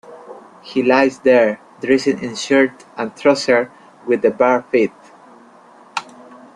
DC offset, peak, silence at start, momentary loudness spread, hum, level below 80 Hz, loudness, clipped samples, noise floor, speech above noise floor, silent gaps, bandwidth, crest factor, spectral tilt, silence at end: under 0.1%; -2 dBFS; 0.1 s; 15 LU; none; -62 dBFS; -16 LUFS; under 0.1%; -45 dBFS; 30 dB; none; 10.5 kHz; 16 dB; -4.5 dB/octave; 0.55 s